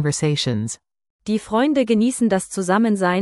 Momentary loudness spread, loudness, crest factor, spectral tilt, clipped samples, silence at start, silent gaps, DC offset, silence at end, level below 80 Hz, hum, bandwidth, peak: 9 LU; -20 LUFS; 14 dB; -5 dB/octave; under 0.1%; 0 s; 1.10-1.19 s; under 0.1%; 0 s; -56 dBFS; none; 12 kHz; -4 dBFS